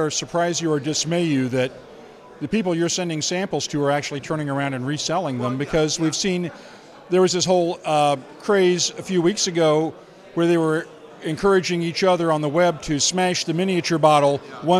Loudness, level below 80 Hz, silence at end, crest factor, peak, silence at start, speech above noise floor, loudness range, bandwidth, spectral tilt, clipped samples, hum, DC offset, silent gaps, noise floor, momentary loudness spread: -21 LUFS; -54 dBFS; 0 s; 18 dB; -2 dBFS; 0 s; 22 dB; 4 LU; 13.5 kHz; -4.5 dB/octave; under 0.1%; none; under 0.1%; none; -43 dBFS; 8 LU